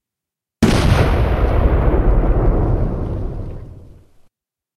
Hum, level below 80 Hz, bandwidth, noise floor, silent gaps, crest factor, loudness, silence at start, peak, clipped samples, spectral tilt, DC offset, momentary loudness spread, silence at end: none; -20 dBFS; 13 kHz; -85 dBFS; none; 16 dB; -17 LUFS; 0.6 s; 0 dBFS; under 0.1%; -7 dB/octave; under 0.1%; 13 LU; 1 s